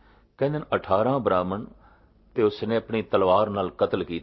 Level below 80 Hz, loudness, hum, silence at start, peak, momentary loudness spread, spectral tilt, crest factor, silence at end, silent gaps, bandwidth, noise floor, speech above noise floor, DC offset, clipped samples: -52 dBFS; -25 LUFS; none; 0.4 s; -6 dBFS; 9 LU; -9.5 dB/octave; 18 dB; 0 s; none; 6 kHz; -56 dBFS; 32 dB; under 0.1%; under 0.1%